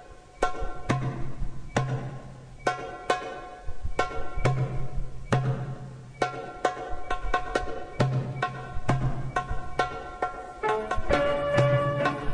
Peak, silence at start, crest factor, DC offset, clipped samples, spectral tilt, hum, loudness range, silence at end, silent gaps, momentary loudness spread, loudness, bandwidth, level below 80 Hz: -8 dBFS; 0 s; 20 dB; under 0.1%; under 0.1%; -6 dB/octave; none; 5 LU; 0 s; none; 13 LU; -30 LUFS; 10.5 kHz; -38 dBFS